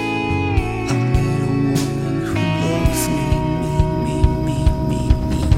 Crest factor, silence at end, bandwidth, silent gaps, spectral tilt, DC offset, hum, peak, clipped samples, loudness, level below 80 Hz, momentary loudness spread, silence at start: 16 dB; 0 s; 16.5 kHz; none; -6.5 dB/octave; under 0.1%; none; -2 dBFS; under 0.1%; -19 LUFS; -24 dBFS; 2 LU; 0 s